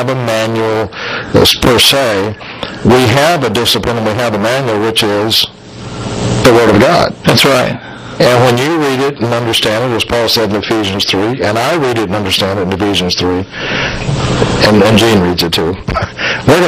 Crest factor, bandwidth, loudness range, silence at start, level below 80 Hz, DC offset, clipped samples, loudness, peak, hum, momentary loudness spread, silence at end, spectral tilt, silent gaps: 10 dB; 16 kHz; 3 LU; 0 s; -34 dBFS; under 0.1%; 0.5%; -11 LUFS; 0 dBFS; none; 10 LU; 0 s; -4.5 dB/octave; none